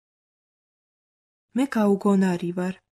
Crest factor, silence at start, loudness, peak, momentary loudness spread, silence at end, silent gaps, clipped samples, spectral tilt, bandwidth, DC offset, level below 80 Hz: 16 dB; 1.55 s; -23 LUFS; -10 dBFS; 9 LU; 0.15 s; none; under 0.1%; -7.5 dB/octave; 13.5 kHz; under 0.1%; -70 dBFS